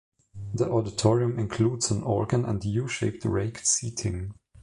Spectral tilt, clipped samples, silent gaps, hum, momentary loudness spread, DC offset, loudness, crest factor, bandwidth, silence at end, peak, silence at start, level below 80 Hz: -5 dB/octave; under 0.1%; none; none; 8 LU; under 0.1%; -27 LUFS; 20 dB; 11.5 kHz; 0.3 s; -8 dBFS; 0.35 s; -48 dBFS